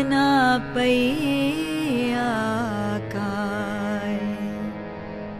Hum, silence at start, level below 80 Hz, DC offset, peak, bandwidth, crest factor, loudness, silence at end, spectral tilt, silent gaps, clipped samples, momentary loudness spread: none; 0 s; -50 dBFS; under 0.1%; -8 dBFS; 14 kHz; 16 dB; -23 LUFS; 0 s; -5.5 dB/octave; none; under 0.1%; 11 LU